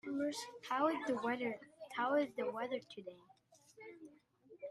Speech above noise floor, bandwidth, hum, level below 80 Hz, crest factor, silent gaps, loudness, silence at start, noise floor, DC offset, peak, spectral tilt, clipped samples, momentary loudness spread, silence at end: 27 dB; 14 kHz; none; -86 dBFS; 20 dB; none; -39 LUFS; 0.05 s; -66 dBFS; under 0.1%; -22 dBFS; -4 dB/octave; under 0.1%; 20 LU; 0 s